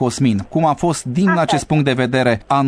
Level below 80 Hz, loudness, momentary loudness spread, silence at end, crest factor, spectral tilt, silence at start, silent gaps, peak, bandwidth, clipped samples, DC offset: -46 dBFS; -16 LUFS; 2 LU; 0 s; 14 dB; -6 dB/octave; 0 s; none; 0 dBFS; 11 kHz; under 0.1%; under 0.1%